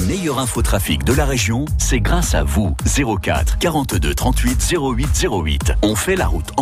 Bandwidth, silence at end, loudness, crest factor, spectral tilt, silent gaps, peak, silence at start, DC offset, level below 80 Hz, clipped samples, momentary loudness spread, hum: 15.5 kHz; 0 s; -18 LUFS; 12 dB; -4.5 dB/octave; none; -4 dBFS; 0 s; under 0.1%; -20 dBFS; under 0.1%; 2 LU; none